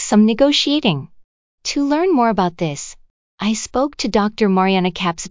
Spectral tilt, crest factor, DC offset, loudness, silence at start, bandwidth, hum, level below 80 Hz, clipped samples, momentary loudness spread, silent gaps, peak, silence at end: -4.5 dB/octave; 16 dB; 0.2%; -17 LUFS; 0 s; 7.6 kHz; none; -48 dBFS; under 0.1%; 10 LU; 1.24-1.58 s, 3.10-3.38 s; -2 dBFS; 0 s